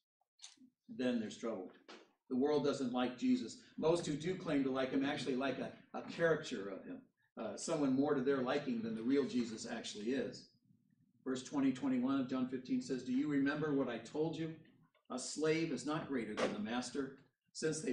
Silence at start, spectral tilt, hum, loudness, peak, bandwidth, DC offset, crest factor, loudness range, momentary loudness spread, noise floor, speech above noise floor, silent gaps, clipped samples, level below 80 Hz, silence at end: 0.4 s; -5 dB/octave; none; -39 LUFS; -22 dBFS; 10.5 kHz; under 0.1%; 18 dB; 3 LU; 14 LU; -74 dBFS; 36 dB; 7.32-7.36 s; under 0.1%; -76 dBFS; 0 s